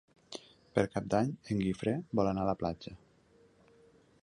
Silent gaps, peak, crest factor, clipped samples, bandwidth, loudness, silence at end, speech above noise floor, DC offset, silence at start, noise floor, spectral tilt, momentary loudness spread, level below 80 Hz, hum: none; -12 dBFS; 24 dB; under 0.1%; 11 kHz; -33 LUFS; 1.25 s; 32 dB; under 0.1%; 0.3 s; -65 dBFS; -7 dB/octave; 16 LU; -58 dBFS; none